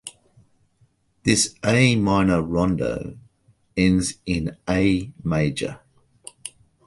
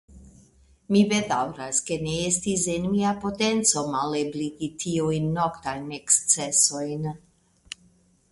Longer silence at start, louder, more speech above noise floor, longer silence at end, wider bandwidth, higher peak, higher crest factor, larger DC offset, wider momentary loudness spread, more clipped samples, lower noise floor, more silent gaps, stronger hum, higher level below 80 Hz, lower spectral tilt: about the same, 0.05 s vs 0.1 s; first, -21 LUFS vs -24 LUFS; first, 42 dB vs 36 dB; second, 0.4 s vs 1.15 s; about the same, 11.5 kHz vs 11.5 kHz; about the same, -2 dBFS vs -4 dBFS; about the same, 20 dB vs 22 dB; neither; first, 19 LU vs 13 LU; neither; about the same, -63 dBFS vs -60 dBFS; neither; neither; first, -42 dBFS vs -56 dBFS; first, -5 dB/octave vs -3.5 dB/octave